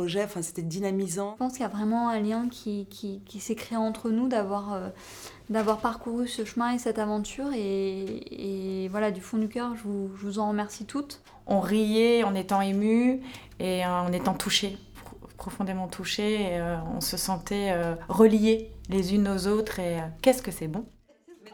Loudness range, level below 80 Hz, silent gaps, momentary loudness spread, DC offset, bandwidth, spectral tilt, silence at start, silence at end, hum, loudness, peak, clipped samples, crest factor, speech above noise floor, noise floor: 5 LU; -52 dBFS; none; 12 LU; under 0.1%; over 20 kHz; -5 dB/octave; 0 s; 0.05 s; none; -28 LUFS; -6 dBFS; under 0.1%; 22 dB; 27 dB; -55 dBFS